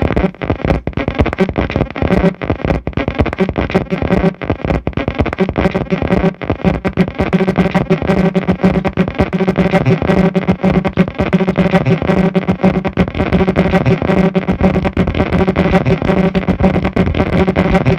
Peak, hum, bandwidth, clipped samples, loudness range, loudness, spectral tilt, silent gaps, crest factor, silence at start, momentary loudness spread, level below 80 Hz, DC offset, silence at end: 0 dBFS; none; 7.8 kHz; under 0.1%; 3 LU; -14 LUFS; -8.5 dB/octave; none; 14 dB; 0 s; 4 LU; -26 dBFS; under 0.1%; 0 s